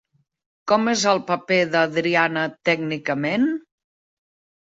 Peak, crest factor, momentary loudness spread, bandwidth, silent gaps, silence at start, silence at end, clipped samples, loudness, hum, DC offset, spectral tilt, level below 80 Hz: -4 dBFS; 18 dB; 5 LU; 8 kHz; none; 0.65 s; 1.1 s; under 0.1%; -21 LUFS; none; under 0.1%; -4 dB/octave; -68 dBFS